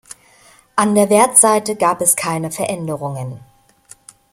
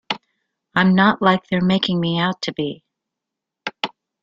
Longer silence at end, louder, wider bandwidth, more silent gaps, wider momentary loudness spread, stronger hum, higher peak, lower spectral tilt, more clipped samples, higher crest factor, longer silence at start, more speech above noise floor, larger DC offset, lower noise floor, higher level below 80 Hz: first, 0.95 s vs 0.35 s; first, -15 LUFS vs -19 LUFS; first, 16.5 kHz vs 7.4 kHz; neither; about the same, 15 LU vs 14 LU; neither; about the same, 0 dBFS vs -2 dBFS; second, -3.5 dB/octave vs -6.5 dB/octave; neither; about the same, 18 dB vs 20 dB; about the same, 0.1 s vs 0.1 s; second, 34 dB vs 66 dB; neither; second, -49 dBFS vs -84 dBFS; about the same, -60 dBFS vs -58 dBFS